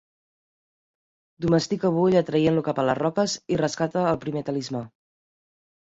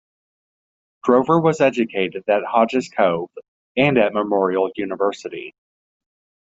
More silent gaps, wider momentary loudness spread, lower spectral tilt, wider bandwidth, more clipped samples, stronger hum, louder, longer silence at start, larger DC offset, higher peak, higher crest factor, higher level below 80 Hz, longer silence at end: second, none vs 3.48-3.75 s; second, 9 LU vs 13 LU; about the same, -6 dB/octave vs -6.5 dB/octave; about the same, 8 kHz vs 7.8 kHz; neither; neither; second, -24 LUFS vs -19 LUFS; first, 1.4 s vs 1.05 s; neither; second, -8 dBFS vs -2 dBFS; about the same, 18 dB vs 18 dB; about the same, -58 dBFS vs -62 dBFS; about the same, 0.95 s vs 0.95 s